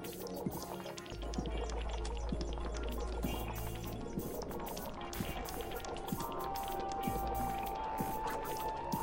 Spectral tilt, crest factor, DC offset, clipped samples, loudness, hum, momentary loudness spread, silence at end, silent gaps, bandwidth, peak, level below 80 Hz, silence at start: -5 dB/octave; 16 dB; under 0.1%; under 0.1%; -41 LUFS; none; 5 LU; 0 s; none; 17 kHz; -22 dBFS; -46 dBFS; 0 s